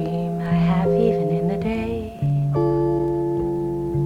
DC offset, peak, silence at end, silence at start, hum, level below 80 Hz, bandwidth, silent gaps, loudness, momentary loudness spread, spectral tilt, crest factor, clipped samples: under 0.1%; -8 dBFS; 0 s; 0 s; none; -40 dBFS; 5.6 kHz; none; -22 LUFS; 6 LU; -9.5 dB/octave; 14 dB; under 0.1%